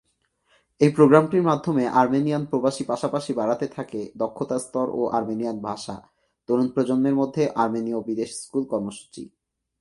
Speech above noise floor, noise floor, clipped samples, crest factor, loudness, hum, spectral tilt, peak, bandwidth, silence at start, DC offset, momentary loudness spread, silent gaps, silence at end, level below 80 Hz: 46 dB; -68 dBFS; under 0.1%; 22 dB; -23 LUFS; none; -7 dB/octave; -2 dBFS; 11.5 kHz; 0.8 s; under 0.1%; 14 LU; none; 0.55 s; -64 dBFS